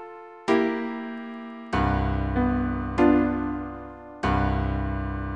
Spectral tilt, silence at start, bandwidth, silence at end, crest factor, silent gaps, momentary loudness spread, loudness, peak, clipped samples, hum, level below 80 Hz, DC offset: -8 dB/octave; 0 s; 9.2 kHz; 0 s; 18 dB; none; 15 LU; -25 LUFS; -8 dBFS; under 0.1%; none; -34 dBFS; under 0.1%